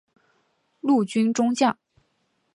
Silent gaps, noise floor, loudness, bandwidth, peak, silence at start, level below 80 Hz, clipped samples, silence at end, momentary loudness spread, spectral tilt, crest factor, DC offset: none; -71 dBFS; -22 LUFS; 11 kHz; -8 dBFS; 0.85 s; -74 dBFS; under 0.1%; 0.8 s; 8 LU; -5 dB/octave; 18 dB; under 0.1%